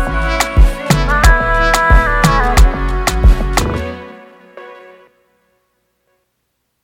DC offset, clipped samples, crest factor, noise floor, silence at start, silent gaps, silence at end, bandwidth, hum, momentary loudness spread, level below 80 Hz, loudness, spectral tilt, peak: under 0.1%; under 0.1%; 12 dB; -68 dBFS; 0 s; none; 2.1 s; 16.5 kHz; none; 14 LU; -16 dBFS; -13 LUFS; -4.5 dB/octave; 0 dBFS